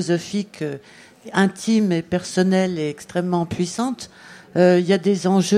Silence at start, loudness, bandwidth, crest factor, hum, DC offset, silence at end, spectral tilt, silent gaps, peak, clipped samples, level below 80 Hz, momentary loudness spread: 0 s; -21 LUFS; 12.5 kHz; 18 dB; none; under 0.1%; 0 s; -6 dB/octave; none; -2 dBFS; under 0.1%; -58 dBFS; 12 LU